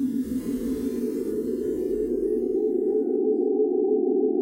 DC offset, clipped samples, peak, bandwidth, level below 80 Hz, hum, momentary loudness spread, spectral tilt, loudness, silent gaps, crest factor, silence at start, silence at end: under 0.1%; under 0.1%; -14 dBFS; 16 kHz; -52 dBFS; none; 5 LU; -8 dB/octave; -25 LUFS; none; 12 dB; 0 s; 0 s